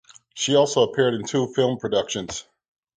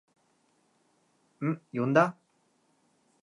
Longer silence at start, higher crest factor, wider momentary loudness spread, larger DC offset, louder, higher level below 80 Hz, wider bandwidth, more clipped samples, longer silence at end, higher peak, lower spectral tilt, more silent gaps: second, 0.35 s vs 1.4 s; second, 18 dB vs 26 dB; first, 13 LU vs 9 LU; neither; first, -22 LUFS vs -28 LUFS; first, -60 dBFS vs -86 dBFS; second, 9.6 kHz vs 11 kHz; neither; second, 0.55 s vs 1.1 s; about the same, -6 dBFS vs -8 dBFS; second, -4 dB/octave vs -7.5 dB/octave; neither